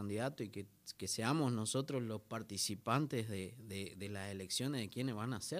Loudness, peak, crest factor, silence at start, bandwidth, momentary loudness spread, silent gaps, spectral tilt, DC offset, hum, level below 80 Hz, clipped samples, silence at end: -40 LUFS; -20 dBFS; 20 dB; 0 s; 15.5 kHz; 10 LU; none; -4.5 dB/octave; under 0.1%; none; -80 dBFS; under 0.1%; 0 s